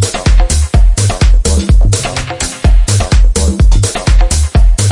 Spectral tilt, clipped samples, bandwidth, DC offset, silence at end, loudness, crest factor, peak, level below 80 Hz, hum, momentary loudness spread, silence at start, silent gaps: -4.5 dB/octave; under 0.1%; 11.5 kHz; under 0.1%; 0 s; -11 LUFS; 8 dB; 0 dBFS; -10 dBFS; none; 3 LU; 0 s; none